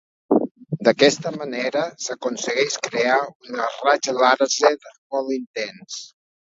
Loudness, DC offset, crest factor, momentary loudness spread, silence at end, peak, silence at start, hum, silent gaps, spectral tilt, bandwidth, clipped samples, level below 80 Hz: -21 LUFS; under 0.1%; 22 dB; 13 LU; 0.45 s; 0 dBFS; 0.3 s; none; 0.51-0.55 s, 3.35-3.40 s, 4.98-5.10 s, 5.47-5.54 s; -3 dB/octave; 7.8 kHz; under 0.1%; -72 dBFS